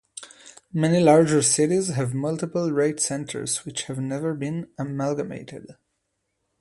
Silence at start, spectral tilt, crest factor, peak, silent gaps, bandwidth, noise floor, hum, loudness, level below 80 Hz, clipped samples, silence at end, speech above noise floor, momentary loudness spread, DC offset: 0.15 s; -5 dB/octave; 20 dB; -4 dBFS; none; 11.5 kHz; -76 dBFS; none; -23 LUFS; -62 dBFS; under 0.1%; 0.9 s; 53 dB; 19 LU; under 0.1%